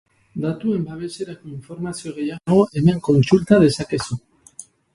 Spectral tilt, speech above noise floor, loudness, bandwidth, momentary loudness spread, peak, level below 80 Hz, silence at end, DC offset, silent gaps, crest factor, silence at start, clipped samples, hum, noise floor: -7 dB/octave; 25 dB; -19 LUFS; 11.5 kHz; 20 LU; 0 dBFS; -50 dBFS; 0.35 s; under 0.1%; none; 20 dB; 0.35 s; under 0.1%; none; -44 dBFS